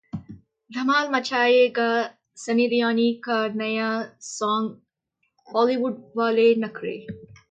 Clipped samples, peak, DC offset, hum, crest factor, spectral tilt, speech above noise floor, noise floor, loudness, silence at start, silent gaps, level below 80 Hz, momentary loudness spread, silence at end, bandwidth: under 0.1%; -8 dBFS; under 0.1%; none; 16 dB; -4.5 dB/octave; 53 dB; -75 dBFS; -23 LUFS; 0.15 s; none; -66 dBFS; 16 LU; 0.3 s; 9.2 kHz